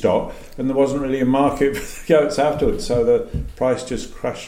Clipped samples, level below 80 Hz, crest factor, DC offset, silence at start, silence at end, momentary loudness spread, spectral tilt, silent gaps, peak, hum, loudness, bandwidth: under 0.1%; -34 dBFS; 16 dB; under 0.1%; 0 s; 0 s; 10 LU; -6 dB/octave; none; -2 dBFS; none; -20 LUFS; 16.5 kHz